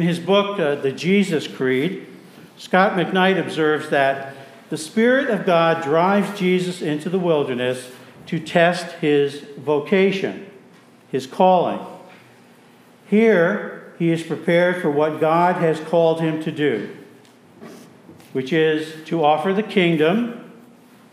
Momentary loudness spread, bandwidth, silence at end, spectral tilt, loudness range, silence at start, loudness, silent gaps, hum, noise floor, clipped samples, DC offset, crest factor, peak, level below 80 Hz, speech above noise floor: 12 LU; 15 kHz; 0.6 s; -6 dB/octave; 3 LU; 0 s; -19 LUFS; none; none; -49 dBFS; under 0.1%; under 0.1%; 18 dB; -2 dBFS; -78 dBFS; 31 dB